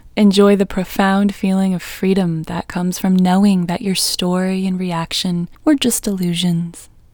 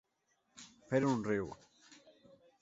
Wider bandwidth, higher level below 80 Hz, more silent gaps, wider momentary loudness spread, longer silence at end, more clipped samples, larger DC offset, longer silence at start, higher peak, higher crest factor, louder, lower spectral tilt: first, 20 kHz vs 8 kHz; first, -44 dBFS vs -70 dBFS; neither; second, 8 LU vs 23 LU; second, 0.3 s vs 0.7 s; neither; neither; second, 0.05 s vs 0.55 s; first, 0 dBFS vs -18 dBFS; about the same, 16 dB vs 20 dB; first, -16 LUFS vs -36 LUFS; about the same, -5.5 dB/octave vs -6.5 dB/octave